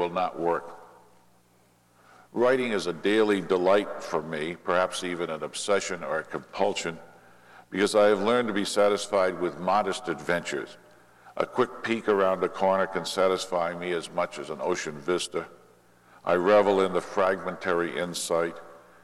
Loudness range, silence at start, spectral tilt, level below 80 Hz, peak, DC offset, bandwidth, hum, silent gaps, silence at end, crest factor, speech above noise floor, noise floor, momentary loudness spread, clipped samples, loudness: 4 LU; 0 s; -4 dB/octave; -68 dBFS; -8 dBFS; under 0.1%; 13.5 kHz; 60 Hz at -65 dBFS; none; 0.25 s; 18 dB; 36 dB; -62 dBFS; 10 LU; under 0.1%; -27 LUFS